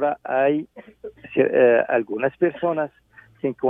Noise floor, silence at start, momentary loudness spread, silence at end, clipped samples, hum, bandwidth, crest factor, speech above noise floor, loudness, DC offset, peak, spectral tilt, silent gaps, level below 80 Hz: -40 dBFS; 0 s; 23 LU; 0 s; under 0.1%; none; 3.7 kHz; 18 dB; 19 dB; -21 LUFS; under 0.1%; -4 dBFS; -9.5 dB/octave; none; -64 dBFS